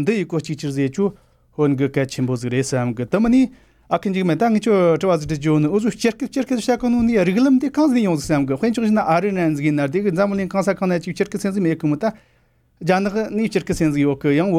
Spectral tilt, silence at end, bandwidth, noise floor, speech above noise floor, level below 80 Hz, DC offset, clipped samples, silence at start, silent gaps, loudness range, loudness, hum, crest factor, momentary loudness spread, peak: -6.5 dB/octave; 0 s; 15 kHz; -59 dBFS; 41 dB; -48 dBFS; under 0.1%; under 0.1%; 0 s; none; 4 LU; -19 LUFS; none; 14 dB; 7 LU; -4 dBFS